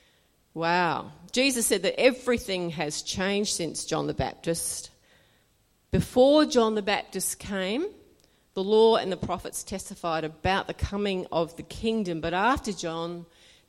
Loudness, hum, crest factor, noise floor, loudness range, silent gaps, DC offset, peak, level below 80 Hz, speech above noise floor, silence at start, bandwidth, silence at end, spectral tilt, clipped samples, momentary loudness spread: -26 LUFS; none; 20 dB; -66 dBFS; 4 LU; none; under 0.1%; -8 dBFS; -48 dBFS; 40 dB; 0.55 s; 16.5 kHz; 0.45 s; -4 dB/octave; under 0.1%; 13 LU